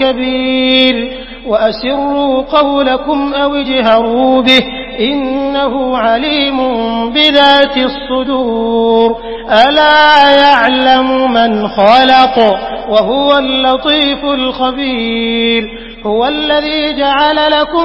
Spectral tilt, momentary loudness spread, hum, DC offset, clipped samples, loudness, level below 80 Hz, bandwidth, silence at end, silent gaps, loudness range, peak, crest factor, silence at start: -5 dB/octave; 8 LU; none; under 0.1%; 0.3%; -10 LUFS; -36 dBFS; 8 kHz; 0 s; none; 5 LU; 0 dBFS; 10 dB; 0 s